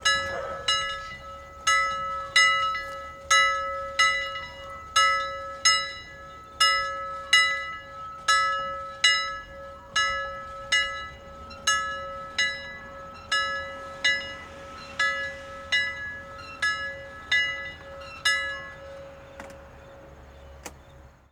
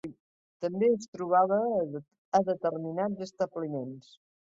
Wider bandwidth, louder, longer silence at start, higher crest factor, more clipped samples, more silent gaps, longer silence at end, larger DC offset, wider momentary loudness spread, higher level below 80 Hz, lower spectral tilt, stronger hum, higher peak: first, 17 kHz vs 7.8 kHz; first, -25 LUFS vs -30 LUFS; about the same, 0 s vs 0.05 s; about the same, 24 dB vs 20 dB; neither; second, none vs 0.20-0.60 s, 1.08-1.13 s, 2.18-2.32 s; second, 0.2 s vs 0.6 s; neither; first, 21 LU vs 14 LU; first, -52 dBFS vs -74 dBFS; second, 0.5 dB/octave vs -7 dB/octave; neither; first, -4 dBFS vs -12 dBFS